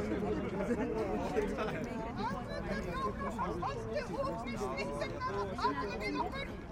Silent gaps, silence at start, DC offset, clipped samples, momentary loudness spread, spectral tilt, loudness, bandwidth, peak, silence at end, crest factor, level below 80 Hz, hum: none; 0 s; under 0.1%; under 0.1%; 4 LU; -6.5 dB/octave; -37 LUFS; 16 kHz; -20 dBFS; 0 s; 16 dB; -50 dBFS; none